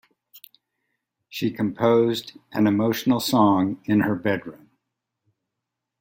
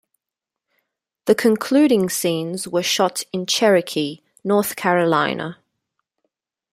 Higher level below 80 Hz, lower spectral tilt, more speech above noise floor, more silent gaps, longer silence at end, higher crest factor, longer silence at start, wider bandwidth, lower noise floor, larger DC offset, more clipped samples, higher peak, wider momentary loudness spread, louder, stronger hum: about the same, -64 dBFS vs -66 dBFS; first, -6 dB/octave vs -4 dB/octave; second, 62 dB vs 68 dB; neither; first, 1.45 s vs 1.2 s; about the same, 18 dB vs 18 dB; second, 0.35 s vs 1.25 s; about the same, 16.5 kHz vs 16 kHz; about the same, -83 dBFS vs -86 dBFS; neither; neither; second, -6 dBFS vs -2 dBFS; about the same, 11 LU vs 11 LU; second, -22 LUFS vs -19 LUFS; neither